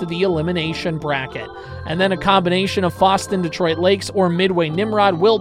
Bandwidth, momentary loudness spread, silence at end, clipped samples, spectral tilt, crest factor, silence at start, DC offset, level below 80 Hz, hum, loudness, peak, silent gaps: 15 kHz; 8 LU; 0 s; under 0.1%; -5.5 dB/octave; 16 dB; 0 s; under 0.1%; -46 dBFS; none; -18 LUFS; -2 dBFS; none